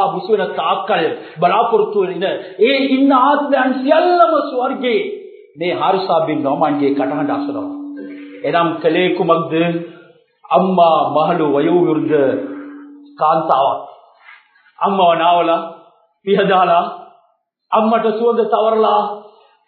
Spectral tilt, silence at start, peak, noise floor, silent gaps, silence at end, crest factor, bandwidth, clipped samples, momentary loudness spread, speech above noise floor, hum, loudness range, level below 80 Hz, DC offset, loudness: -9.5 dB/octave; 0 s; 0 dBFS; -61 dBFS; none; 0.45 s; 16 dB; 4.6 kHz; under 0.1%; 13 LU; 47 dB; none; 4 LU; -74 dBFS; under 0.1%; -15 LUFS